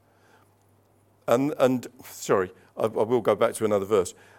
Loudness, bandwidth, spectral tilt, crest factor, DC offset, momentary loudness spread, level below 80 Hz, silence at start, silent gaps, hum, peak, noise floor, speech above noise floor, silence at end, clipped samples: -25 LUFS; 17.5 kHz; -5.5 dB/octave; 20 dB; under 0.1%; 11 LU; -70 dBFS; 1.25 s; none; none; -6 dBFS; -62 dBFS; 37 dB; 0.25 s; under 0.1%